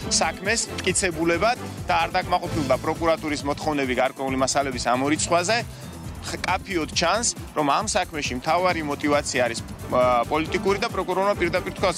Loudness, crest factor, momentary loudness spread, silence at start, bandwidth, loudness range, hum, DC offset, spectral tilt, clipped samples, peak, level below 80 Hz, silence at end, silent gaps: -23 LUFS; 16 dB; 5 LU; 0 s; 16 kHz; 1 LU; none; under 0.1%; -3.5 dB/octave; under 0.1%; -8 dBFS; -44 dBFS; 0 s; none